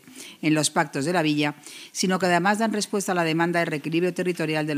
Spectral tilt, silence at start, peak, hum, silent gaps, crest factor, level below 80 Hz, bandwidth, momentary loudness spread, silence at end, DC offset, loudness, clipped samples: -4.5 dB/octave; 0.05 s; -8 dBFS; none; none; 16 dB; -74 dBFS; 15.5 kHz; 7 LU; 0 s; under 0.1%; -23 LUFS; under 0.1%